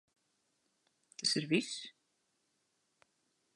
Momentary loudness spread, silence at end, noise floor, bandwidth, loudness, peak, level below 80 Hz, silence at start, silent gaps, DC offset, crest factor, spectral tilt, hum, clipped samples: 20 LU; 1.65 s; -80 dBFS; 11.5 kHz; -35 LUFS; -18 dBFS; -88 dBFS; 1.2 s; none; under 0.1%; 24 dB; -3 dB/octave; none; under 0.1%